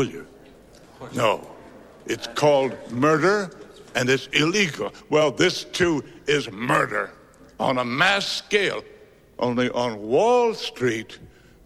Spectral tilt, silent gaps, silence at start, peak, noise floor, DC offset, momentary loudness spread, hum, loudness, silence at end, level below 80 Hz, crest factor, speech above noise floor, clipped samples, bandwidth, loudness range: -4 dB/octave; none; 0 s; -4 dBFS; -49 dBFS; under 0.1%; 12 LU; none; -22 LUFS; 0.4 s; -58 dBFS; 20 dB; 26 dB; under 0.1%; 15 kHz; 2 LU